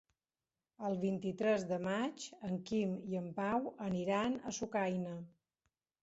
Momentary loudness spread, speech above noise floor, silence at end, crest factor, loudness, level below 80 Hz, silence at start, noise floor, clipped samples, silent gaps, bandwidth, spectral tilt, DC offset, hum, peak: 8 LU; over 53 dB; 0.75 s; 18 dB; -38 LUFS; -72 dBFS; 0.8 s; under -90 dBFS; under 0.1%; none; 8 kHz; -5.5 dB/octave; under 0.1%; none; -22 dBFS